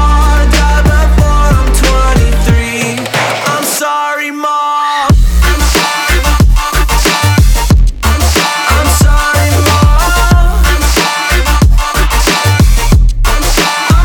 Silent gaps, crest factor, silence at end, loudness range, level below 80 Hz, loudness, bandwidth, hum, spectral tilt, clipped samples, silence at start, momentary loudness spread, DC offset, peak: none; 8 dB; 0 s; 2 LU; -10 dBFS; -10 LUFS; 19 kHz; none; -4 dB/octave; under 0.1%; 0 s; 3 LU; under 0.1%; 0 dBFS